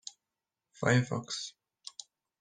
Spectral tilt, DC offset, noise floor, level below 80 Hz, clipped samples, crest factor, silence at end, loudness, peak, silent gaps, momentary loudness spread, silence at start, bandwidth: -5 dB/octave; under 0.1%; -89 dBFS; -68 dBFS; under 0.1%; 24 dB; 0.9 s; -32 LUFS; -12 dBFS; none; 21 LU; 0.05 s; 9.8 kHz